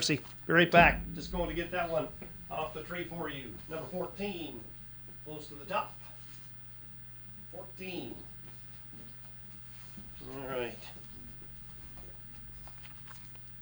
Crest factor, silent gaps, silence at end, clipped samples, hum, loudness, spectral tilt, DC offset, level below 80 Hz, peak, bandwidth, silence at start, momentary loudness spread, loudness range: 28 dB; none; 0 s; under 0.1%; 60 Hz at -55 dBFS; -34 LUFS; -4.5 dB/octave; under 0.1%; -52 dBFS; -8 dBFS; over 20 kHz; 0 s; 15 LU; 14 LU